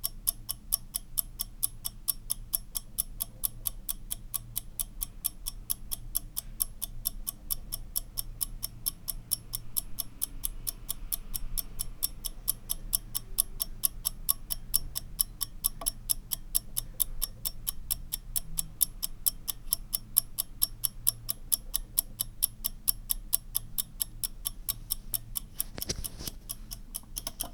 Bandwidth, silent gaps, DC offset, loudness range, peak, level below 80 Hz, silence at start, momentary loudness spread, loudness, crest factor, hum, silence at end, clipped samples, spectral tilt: over 20 kHz; none; under 0.1%; 5 LU; -4 dBFS; -44 dBFS; 0 s; 7 LU; -32 LUFS; 32 dB; none; 0 s; under 0.1%; -1 dB/octave